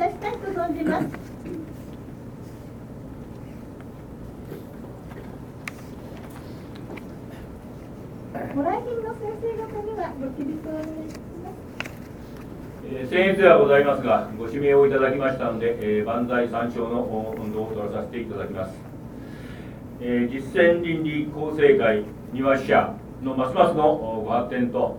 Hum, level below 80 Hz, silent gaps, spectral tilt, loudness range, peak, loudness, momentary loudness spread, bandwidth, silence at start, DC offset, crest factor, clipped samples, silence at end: none; -48 dBFS; none; -7 dB/octave; 19 LU; -2 dBFS; -23 LUFS; 21 LU; 18.5 kHz; 0 s; under 0.1%; 24 dB; under 0.1%; 0 s